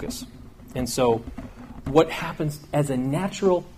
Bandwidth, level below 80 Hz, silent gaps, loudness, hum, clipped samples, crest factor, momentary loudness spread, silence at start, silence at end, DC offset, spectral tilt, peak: 15.5 kHz; -46 dBFS; none; -24 LUFS; none; under 0.1%; 20 dB; 18 LU; 0 s; 0 s; under 0.1%; -5.5 dB/octave; -6 dBFS